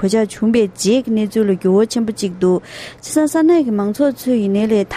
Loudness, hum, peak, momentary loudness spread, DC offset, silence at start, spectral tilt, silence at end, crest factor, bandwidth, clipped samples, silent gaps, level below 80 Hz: -16 LUFS; none; -2 dBFS; 6 LU; under 0.1%; 0 s; -5.5 dB/octave; 0 s; 12 dB; 15 kHz; under 0.1%; none; -52 dBFS